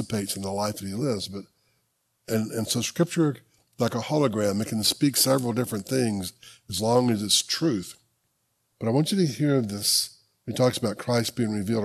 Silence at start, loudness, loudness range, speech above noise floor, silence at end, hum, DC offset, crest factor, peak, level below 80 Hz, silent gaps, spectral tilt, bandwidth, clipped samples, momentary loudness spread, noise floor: 0 s; -25 LUFS; 4 LU; 48 dB; 0 s; none; under 0.1%; 20 dB; -6 dBFS; -64 dBFS; none; -4.5 dB/octave; 13.5 kHz; under 0.1%; 11 LU; -73 dBFS